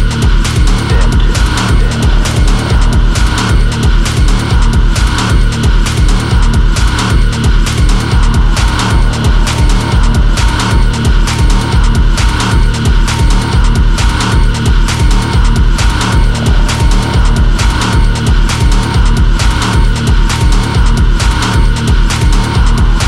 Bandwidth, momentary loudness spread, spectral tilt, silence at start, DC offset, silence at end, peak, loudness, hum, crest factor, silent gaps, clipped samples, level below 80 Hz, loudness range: 12.5 kHz; 1 LU; -5 dB/octave; 0 s; under 0.1%; 0 s; 0 dBFS; -11 LUFS; none; 8 dB; none; under 0.1%; -10 dBFS; 0 LU